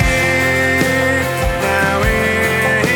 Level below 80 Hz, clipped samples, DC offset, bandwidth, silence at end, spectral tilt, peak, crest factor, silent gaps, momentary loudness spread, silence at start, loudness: -26 dBFS; under 0.1%; under 0.1%; 19.5 kHz; 0 s; -4.5 dB/octave; -2 dBFS; 14 dB; none; 3 LU; 0 s; -14 LUFS